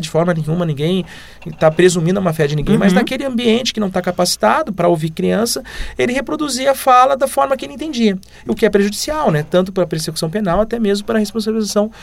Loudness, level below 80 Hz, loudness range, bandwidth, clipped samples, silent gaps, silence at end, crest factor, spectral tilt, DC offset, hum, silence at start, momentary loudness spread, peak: -16 LUFS; -38 dBFS; 2 LU; 16.5 kHz; under 0.1%; none; 0 s; 16 dB; -5 dB/octave; under 0.1%; none; 0 s; 7 LU; 0 dBFS